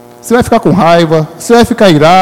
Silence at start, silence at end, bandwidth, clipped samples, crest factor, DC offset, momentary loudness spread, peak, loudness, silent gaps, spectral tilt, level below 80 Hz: 0.25 s; 0 s; 16.5 kHz; 5%; 6 dB; under 0.1%; 6 LU; 0 dBFS; -7 LUFS; none; -5.5 dB/octave; -34 dBFS